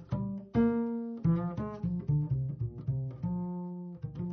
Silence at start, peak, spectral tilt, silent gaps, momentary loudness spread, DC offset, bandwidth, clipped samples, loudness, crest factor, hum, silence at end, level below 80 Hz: 0 s; -16 dBFS; -11.5 dB/octave; none; 10 LU; under 0.1%; 5 kHz; under 0.1%; -34 LUFS; 16 dB; none; 0 s; -52 dBFS